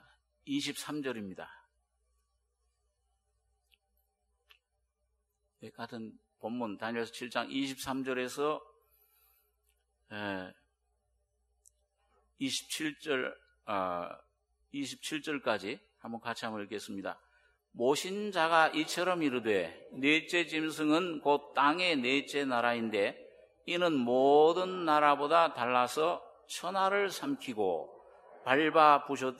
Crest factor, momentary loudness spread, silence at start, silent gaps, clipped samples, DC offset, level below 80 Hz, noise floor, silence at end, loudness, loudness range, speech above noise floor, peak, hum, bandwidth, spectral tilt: 24 dB; 17 LU; 0.45 s; none; under 0.1%; under 0.1%; -78 dBFS; -81 dBFS; 0 s; -31 LUFS; 16 LU; 50 dB; -10 dBFS; none; 14.5 kHz; -3.5 dB/octave